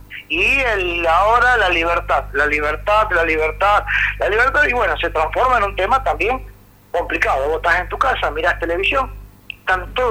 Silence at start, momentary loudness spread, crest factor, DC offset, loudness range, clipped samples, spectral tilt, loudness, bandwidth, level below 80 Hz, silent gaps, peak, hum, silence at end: 0.1 s; 7 LU; 12 dB; under 0.1%; 3 LU; under 0.1%; -4.5 dB/octave; -16 LUFS; 16.5 kHz; -32 dBFS; none; -4 dBFS; 50 Hz at -30 dBFS; 0 s